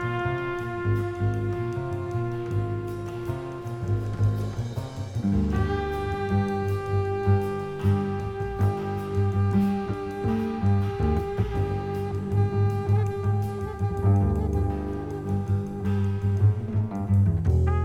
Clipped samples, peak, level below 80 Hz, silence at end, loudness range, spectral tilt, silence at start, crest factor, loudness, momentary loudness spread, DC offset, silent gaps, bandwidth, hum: under 0.1%; -10 dBFS; -38 dBFS; 0 s; 4 LU; -9 dB/octave; 0 s; 14 dB; -27 LUFS; 8 LU; under 0.1%; none; 7.8 kHz; none